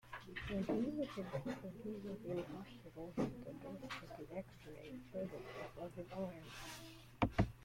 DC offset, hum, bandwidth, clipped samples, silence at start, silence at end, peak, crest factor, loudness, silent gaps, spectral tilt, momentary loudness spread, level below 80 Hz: under 0.1%; none; 16.5 kHz; under 0.1%; 0.05 s; 0 s; -20 dBFS; 26 dB; -46 LUFS; none; -6.5 dB/octave; 13 LU; -60 dBFS